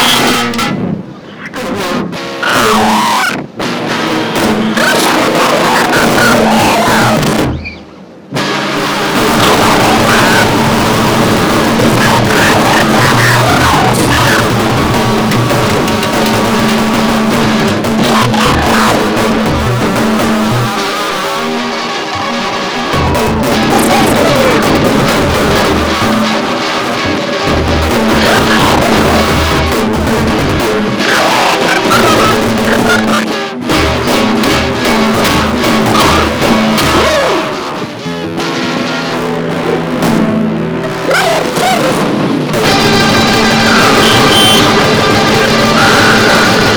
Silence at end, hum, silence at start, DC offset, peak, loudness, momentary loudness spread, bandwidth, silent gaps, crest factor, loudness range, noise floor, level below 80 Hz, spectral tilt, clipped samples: 0 s; none; 0 s; under 0.1%; 0 dBFS; -9 LUFS; 7 LU; over 20 kHz; none; 10 dB; 5 LU; -32 dBFS; -28 dBFS; -4 dB/octave; 0.5%